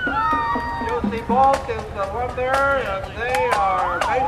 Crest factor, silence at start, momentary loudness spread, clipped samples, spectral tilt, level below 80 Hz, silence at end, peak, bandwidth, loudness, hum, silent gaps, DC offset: 16 dB; 0 s; 8 LU; under 0.1%; -5 dB/octave; -38 dBFS; 0 s; -4 dBFS; 15.5 kHz; -21 LUFS; none; none; under 0.1%